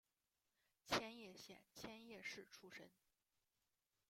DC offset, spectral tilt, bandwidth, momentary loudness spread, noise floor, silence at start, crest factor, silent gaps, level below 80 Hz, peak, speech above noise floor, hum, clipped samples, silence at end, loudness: under 0.1%; -2.5 dB/octave; 16 kHz; 16 LU; under -90 dBFS; 0.85 s; 30 dB; none; -82 dBFS; -26 dBFS; over 31 dB; none; under 0.1%; 1.2 s; -51 LUFS